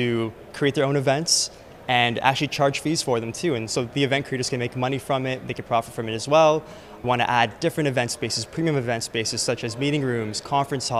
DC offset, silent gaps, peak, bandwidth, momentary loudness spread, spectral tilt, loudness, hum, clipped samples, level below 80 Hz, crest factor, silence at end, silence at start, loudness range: under 0.1%; none; -2 dBFS; 15.5 kHz; 8 LU; -4 dB/octave; -23 LUFS; none; under 0.1%; -56 dBFS; 22 dB; 0 s; 0 s; 3 LU